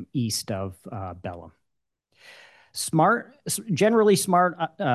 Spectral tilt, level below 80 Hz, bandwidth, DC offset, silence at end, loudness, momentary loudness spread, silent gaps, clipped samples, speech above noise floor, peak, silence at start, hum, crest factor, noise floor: -4.5 dB/octave; -56 dBFS; 13 kHz; under 0.1%; 0 s; -23 LUFS; 17 LU; none; under 0.1%; 57 dB; -8 dBFS; 0 s; none; 18 dB; -80 dBFS